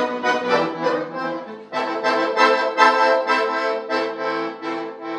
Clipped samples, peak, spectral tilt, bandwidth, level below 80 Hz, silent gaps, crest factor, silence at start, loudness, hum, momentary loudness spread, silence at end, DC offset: under 0.1%; -2 dBFS; -3.5 dB/octave; 10.5 kHz; -84 dBFS; none; 20 dB; 0 s; -20 LUFS; none; 12 LU; 0 s; under 0.1%